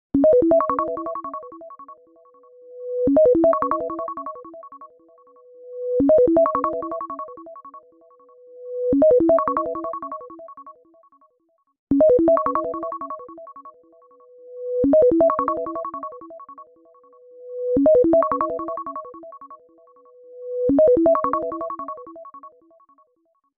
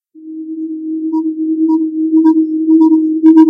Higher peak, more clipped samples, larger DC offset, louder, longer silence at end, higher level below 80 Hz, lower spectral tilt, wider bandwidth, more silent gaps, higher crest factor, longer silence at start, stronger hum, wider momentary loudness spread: second, -6 dBFS vs 0 dBFS; second, under 0.1% vs 0.4%; neither; second, -20 LUFS vs -12 LUFS; first, 1.1 s vs 0 s; first, -52 dBFS vs -82 dBFS; first, -11.5 dB/octave vs -8 dB/octave; first, 2.7 kHz vs 1.7 kHz; first, 11.79-11.87 s vs none; about the same, 16 dB vs 12 dB; about the same, 0.15 s vs 0.15 s; neither; first, 25 LU vs 14 LU